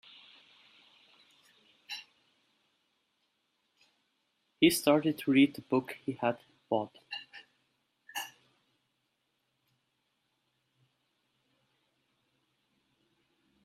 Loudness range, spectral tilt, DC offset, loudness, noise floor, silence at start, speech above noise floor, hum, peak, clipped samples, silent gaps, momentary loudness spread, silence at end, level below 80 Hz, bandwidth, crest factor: 22 LU; -4.5 dB/octave; under 0.1%; -30 LUFS; -80 dBFS; 1.9 s; 51 dB; none; -10 dBFS; under 0.1%; none; 18 LU; 5.35 s; -76 dBFS; 14.5 kHz; 26 dB